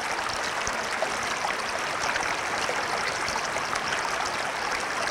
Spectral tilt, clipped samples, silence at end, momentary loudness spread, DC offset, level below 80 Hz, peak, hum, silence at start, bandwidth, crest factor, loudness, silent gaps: -1.5 dB/octave; under 0.1%; 0 s; 1 LU; under 0.1%; -56 dBFS; -10 dBFS; none; 0 s; 18 kHz; 20 dB; -27 LUFS; none